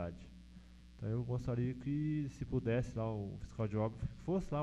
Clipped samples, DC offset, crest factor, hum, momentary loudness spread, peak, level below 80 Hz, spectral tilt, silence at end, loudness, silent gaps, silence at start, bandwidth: under 0.1%; under 0.1%; 16 dB; none; 19 LU; -24 dBFS; -54 dBFS; -9 dB/octave; 0 s; -39 LUFS; none; 0 s; 8.6 kHz